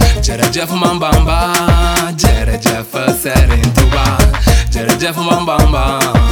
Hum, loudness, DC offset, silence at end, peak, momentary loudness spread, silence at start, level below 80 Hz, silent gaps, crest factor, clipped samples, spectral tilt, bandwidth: none; -12 LUFS; under 0.1%; 0 s; 0 dBFS; 3 LU; 0 s; -14 dBFS; none; 10 dB; 0.2%; -4.5 dB/octave; 20 kHz